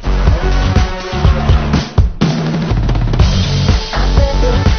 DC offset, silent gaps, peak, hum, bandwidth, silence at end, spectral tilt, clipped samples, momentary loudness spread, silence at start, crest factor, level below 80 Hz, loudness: under 0.1%; none; 0 dBFS; none; 6.6 kHz; 0 s; -6.5 dB/octave; 0.2%; 3 LU; 0 s; 12 dB; -14 dBFS; -14 LUFS